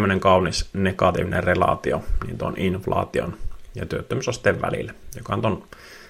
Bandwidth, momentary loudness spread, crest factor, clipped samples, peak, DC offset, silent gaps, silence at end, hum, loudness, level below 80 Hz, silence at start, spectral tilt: 16 kHz; 15 LU; 18 dB; under 0.1%; -4 dBFS; under 0.1%; none; 0 s; none; -23 LUFS; -36 dBFS; 0 s; -5.5 dB/octave